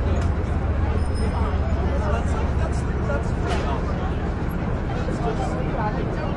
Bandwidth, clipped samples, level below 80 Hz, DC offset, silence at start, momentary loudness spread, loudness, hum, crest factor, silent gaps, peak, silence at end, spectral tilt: 12 kHz; under 0.1%; -26 dBFS; under 0.1%; 0 s; 3 LU; -24 LUFS; none; 12 dB; none; -10 dBFS; 0 s; -7.5 dB/octave